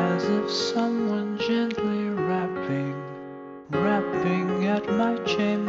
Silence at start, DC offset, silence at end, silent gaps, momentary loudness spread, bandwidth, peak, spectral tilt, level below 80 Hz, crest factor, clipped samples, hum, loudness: 0 s; under 0.1%; 0 s; none; 8 LU; 7.8 kHz; -12 dBFS; -6 dB/octave; -62 dBFS; 14 dB; under 0.1%; none; -25 LUFS